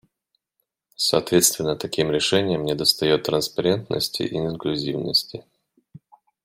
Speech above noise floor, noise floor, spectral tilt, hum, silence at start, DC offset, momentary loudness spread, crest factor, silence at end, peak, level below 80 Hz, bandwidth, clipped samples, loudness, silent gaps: 55 dB; -77 dBFS; -3.5 dB/octave; none; 1 s; under 0.1%; 8 LU; 22 dB; 1.05 s; -2 dBFS; -56 dBFS; 16 kHz; under 0.1%; -21 LUFS; none